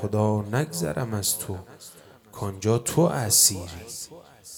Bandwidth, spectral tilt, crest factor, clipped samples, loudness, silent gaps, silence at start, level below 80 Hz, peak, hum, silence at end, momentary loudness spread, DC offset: 20 kHz; -4 dB/octave; 20 dB; under 0.1%; -23 LUFS; none; 0 s; -56 dBFS; -6 dBFS; none; 0 s; 20 LU; under 0.1%